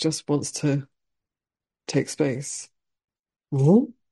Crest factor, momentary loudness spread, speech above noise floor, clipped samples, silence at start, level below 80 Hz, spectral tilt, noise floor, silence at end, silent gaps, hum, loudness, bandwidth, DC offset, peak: 18 dB; 13 LU; over 67 dB; under 0.1%; 0 s; -66 dBFS; -6 dB/octave; under -90 dBFS; 0.2 s; 3.19-3.23 s; none; -24 LUFS; 11.5 kHz; under 0.1%; -6 dBFS